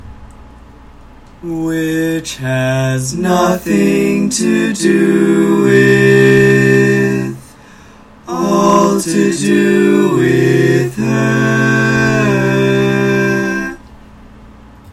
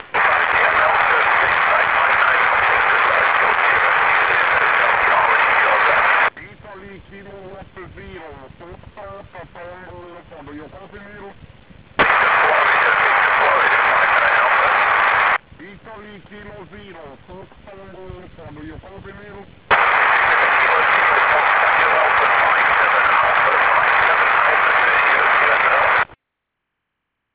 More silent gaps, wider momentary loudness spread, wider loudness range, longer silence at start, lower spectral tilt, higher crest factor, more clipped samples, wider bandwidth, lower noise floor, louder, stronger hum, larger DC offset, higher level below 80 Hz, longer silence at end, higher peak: neither; first, 10 LU vs 3 LU; about the same, 5 LU vs 7 LU; about the same, 0.05 s vs 0 s; about the same, -6 dB/octave vs -5.5 dB/octave; about the same, 12 dB vs 16 dB; neither; first, 16.5 kHz vs 4 kHz; second, -39 dBFS vs -78 dBFS; about the same, -12 LUFS vs -14 LUFS; neither; second, under 0.1% vs 0.1%; first, -42 dBFS vs -50 dBFS; second, 0 s vs 1.3 s; about the same, 0 dBFS vs -2 dBFS